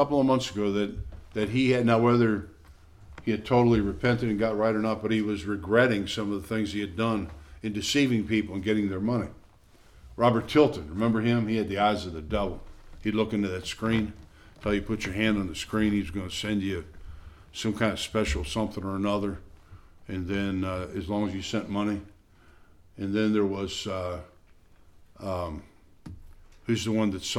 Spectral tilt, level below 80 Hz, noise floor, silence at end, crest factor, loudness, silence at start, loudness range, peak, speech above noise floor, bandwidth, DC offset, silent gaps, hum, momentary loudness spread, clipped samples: -6 dB/octave; -46 dBFS; -55 dBFS; 0 s; 20 dB; -27 LUFS; 0 s; 6 LU; -8 dBFS; 29 dB; 14.5 kHz; under 0.1%; none; none; 13 LU; under 0.1%